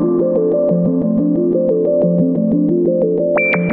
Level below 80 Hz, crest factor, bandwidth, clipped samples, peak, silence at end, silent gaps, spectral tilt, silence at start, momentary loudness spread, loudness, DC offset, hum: -52 dBFS; 10 dB; 3.9 kHz; under 0.1%; -4 dBFS; 0 s; none; -12.5 dB/octave; 0 s; 1 LU; -15 LUFS; under 0.1%; none